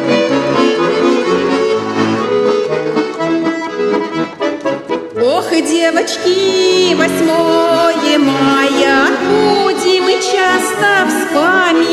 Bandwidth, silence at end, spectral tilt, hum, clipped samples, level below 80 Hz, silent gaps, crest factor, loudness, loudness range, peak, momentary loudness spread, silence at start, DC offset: 14 kHz; 0 s; -3.5 dB/octave; none; under 0.1%; -56 dBFS; none; 12 dB; -12 LUFS; 4 LU; -2 dBFS; 6 LU; 0 s; under 0.1%